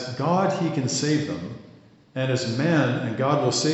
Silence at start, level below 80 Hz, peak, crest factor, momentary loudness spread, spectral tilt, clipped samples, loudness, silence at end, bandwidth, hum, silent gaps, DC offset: 0 s; -64 dBFS; -8 dBFS; 16 dB; 12 LU; -5 dB/octave; under 0.1%; -24 LUFS; 0 s; 8.2 kHz; none; none; under 0.1%